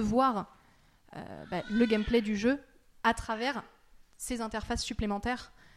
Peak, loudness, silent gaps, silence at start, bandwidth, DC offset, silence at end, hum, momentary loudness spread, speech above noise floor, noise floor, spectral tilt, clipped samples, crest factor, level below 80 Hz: -14 dBFS; -31 LUFS; none; 0 s; 15 kHz; under 0.1%; 0.3 s; none; 16 LU; 32 dB; -63 dBFS; -5 dB/octave; under 0.1%; 20 dB; -48 dBFS